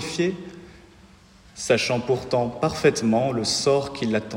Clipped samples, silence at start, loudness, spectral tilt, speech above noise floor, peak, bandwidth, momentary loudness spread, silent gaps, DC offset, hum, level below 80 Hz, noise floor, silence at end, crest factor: under 0.1%; 0 s; -23 LUFS; -4.5 dB/octave; 28 dB; -6 dBFS; 16 kHz; 6 LU; none; under 0.1%; none; -52 dBFS; -51 dBFS; 0 s; 18 dB